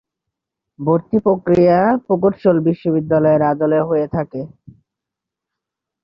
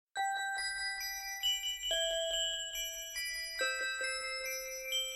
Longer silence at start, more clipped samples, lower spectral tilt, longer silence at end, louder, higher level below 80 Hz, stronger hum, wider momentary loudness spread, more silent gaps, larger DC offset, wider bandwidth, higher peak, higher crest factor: first, 0.8 s vs 0.15 s; neither; first, -10.5 dB/octave vs 2.5 dB/octave; first, 1.55 s vs 0 s; first, -16 LUFS vs -35 LUFS; first, -52 dBFS vs -64 dBFS; neither; first, 11 LU vs 6 LU; neither; neither; second, 5.8 kHz vs 17 kHz; first, -2 dBFS vs -22 dBFS; about the same, 14 dB vs 16 dB